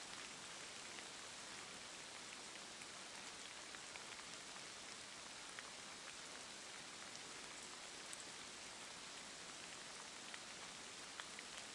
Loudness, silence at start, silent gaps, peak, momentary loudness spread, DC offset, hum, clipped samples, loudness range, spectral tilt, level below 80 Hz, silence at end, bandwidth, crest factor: -52 LUFS; 0 s; none; -30 dBFS; 1 LU; under 0.1%; none; under 0.1%; 0 LU; -0.5 dB/octave; -82 dBFS; 0 s; 12 kHz; 24 dB